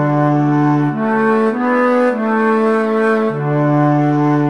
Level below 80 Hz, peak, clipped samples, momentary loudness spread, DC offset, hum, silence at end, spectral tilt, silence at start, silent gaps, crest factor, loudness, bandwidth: -66 dBFS; -4 dBFS; under 0.1%; 2 LU; 0.5%; none; 0 s; -9 dB/octave; 0 s; none; 10 dB; -14 LUFS; 9.4 kHz